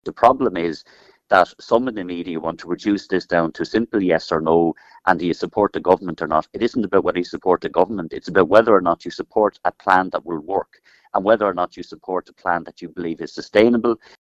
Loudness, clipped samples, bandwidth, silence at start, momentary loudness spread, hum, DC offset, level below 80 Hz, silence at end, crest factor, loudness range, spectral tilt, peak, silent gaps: -20 LUFS; under 0.1%; 9 kHz; 0.05 s; 11 LU; none; under 0.1%; -52 dBFS; 0.25 s; 20 dB; 3 LU; -6.5 dB/octave; 0 dBFS; none